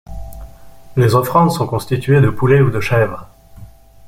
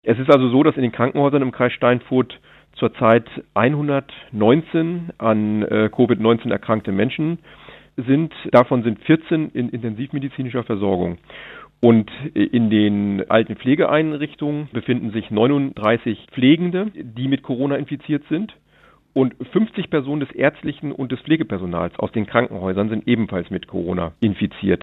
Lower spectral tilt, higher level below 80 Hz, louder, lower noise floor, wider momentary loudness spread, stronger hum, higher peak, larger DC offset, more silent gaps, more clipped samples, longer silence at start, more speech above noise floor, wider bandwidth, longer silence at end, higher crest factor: second, -7 dB/octave vs -9.5 dB/octave; first, -38 dBFS vs -56 dBFS; first, -15 LUFS vs -19 LUFS; second, -38 dBFS vs -53 dBFS; first, 21 LU vs 10 LU; neither; about the same, -2 dBFS vs 0 dBFS; neither; neither; neither; about the same, 0.1 s vs 0.05 s; second, 25 dB vs 35 dB; first, 16 kHz vs 5 kHz; first, 0.4 s vs 0.05 s; second, 14 dB vs 20 dB